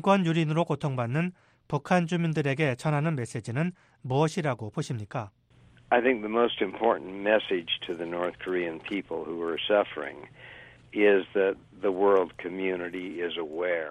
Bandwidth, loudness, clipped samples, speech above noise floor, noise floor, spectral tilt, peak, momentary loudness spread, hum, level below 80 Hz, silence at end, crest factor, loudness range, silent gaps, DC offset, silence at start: 11 kHz; -28 LUFS; under 0.1%; 30 dB; -58 dBFS; -6.5 dB/octave; -8 dBFS; 11 LU; none; -66 dBFS; 0 s; 20 dB; 3 LU; none; under 0.1%; 0 s